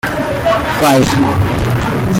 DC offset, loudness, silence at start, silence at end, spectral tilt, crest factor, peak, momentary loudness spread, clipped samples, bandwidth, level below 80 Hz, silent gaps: under 0.1%; -13 LUFS; 0.05 s; 0 s; -5.5 dB/octave; 12 dB; -2 dBFS; 5 LU; under 0.1%; 17 kHz; -30 dBFS; none